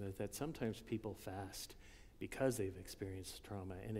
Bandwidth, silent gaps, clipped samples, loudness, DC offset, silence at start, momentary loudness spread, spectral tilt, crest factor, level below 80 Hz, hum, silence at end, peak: 16 kHz; none; under 0.1%; -46 LUFS; under 0.1%; 0 s; 12 LU; -5.5 dB/octave; 20 dB; -62 dBFS; none; 0 s; -24 dBFS